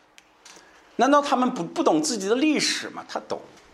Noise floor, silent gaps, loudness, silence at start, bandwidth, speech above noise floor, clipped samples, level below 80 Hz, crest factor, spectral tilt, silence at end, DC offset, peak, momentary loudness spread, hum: -53 dBFS; none; -23 LUFS; 0.45 s; 13.5 kHz; 29 dB; under 0.1%; -72 dBFS; 20 dB; -3 dB/octave; 0.3 s; under 0.1%; -6 dBFS; 15 LU; none